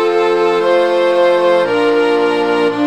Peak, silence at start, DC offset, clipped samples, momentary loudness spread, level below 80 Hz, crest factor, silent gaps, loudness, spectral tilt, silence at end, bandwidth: -2 dBFS; 0 s; 0.4%; under 0.1%; 2 LU; -58 dBFS; 10 dB; none; -13 LUFS; -5 dB/octave; 0 s; 10 kHz